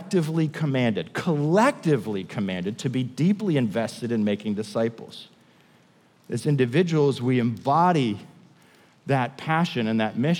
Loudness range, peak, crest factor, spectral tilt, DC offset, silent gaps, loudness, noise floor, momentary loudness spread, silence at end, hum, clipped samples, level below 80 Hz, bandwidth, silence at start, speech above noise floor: 3 LU; -8 dBFS; 16 dB; -7 dB/octave; under 0.1%; none; -24 LUFS; -58 dBFS; 8 LU; 0 s; none; under 0.1%; -76 dBFS; 14.5 kHz; 0 s; 35 dB